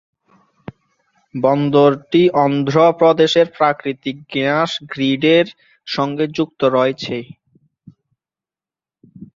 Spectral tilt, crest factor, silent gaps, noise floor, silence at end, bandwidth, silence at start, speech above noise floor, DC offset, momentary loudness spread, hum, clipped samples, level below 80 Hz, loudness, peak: -6.5 dB/octave; 16 dB; none; under -90 dBFS; 0.1 s; 7.6 kHz; 1.35 s; over 75 dB; under 0.1%; 12 LU; none; under 0.1%; -60 dBFS; -16 LUFS; -2 dBFS